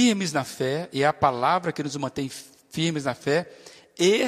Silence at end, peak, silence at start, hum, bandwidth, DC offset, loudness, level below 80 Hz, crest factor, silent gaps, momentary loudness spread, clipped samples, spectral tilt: 0 s; -6 dBFS; 0 s; none; 15.5 kHz; under 0.1%; -25 LUFS; -62 dBFS; 20 dB; none; 13 LU; under 0.1%; -4.5 dB/octave